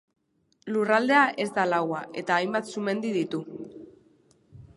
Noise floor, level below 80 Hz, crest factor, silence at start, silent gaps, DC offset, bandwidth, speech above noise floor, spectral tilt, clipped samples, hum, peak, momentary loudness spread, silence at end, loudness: -69 dBFS; -70 dBFS; 20 dB; 0.65 s; none; under 0.1%; 11.5 kHz; 43 dB; -5 dB/octave; under 0.1%; none; -6 dBFS; 18 LU; 0.1 s; -26 LUFS